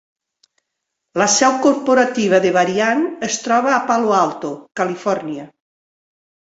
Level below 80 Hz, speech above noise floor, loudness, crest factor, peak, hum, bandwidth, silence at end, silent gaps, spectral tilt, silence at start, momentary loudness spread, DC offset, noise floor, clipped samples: -64 dBFS; 61 dB; -16 LUFS; 16 dB; -2 dBFS; none; 8 kHz; 1.1 s; none; -3.5 dB/octave; 1.15 s; 12 LU; under 0.1%; -78 dBFS; under 0.1%